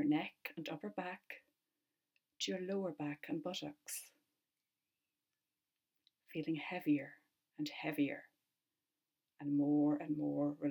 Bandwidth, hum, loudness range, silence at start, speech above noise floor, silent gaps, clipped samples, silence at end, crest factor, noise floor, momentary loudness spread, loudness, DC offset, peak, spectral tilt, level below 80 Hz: 17.5 kHz; none; 9 LU; 0 s; over 51 dB; none; under 0.1%; 0 s; 18 dB; under -90 dBFS; 13 LU; -40 LUFS; under 0.1%; -24 dBFS; -5 dB/octave; -88 dBFS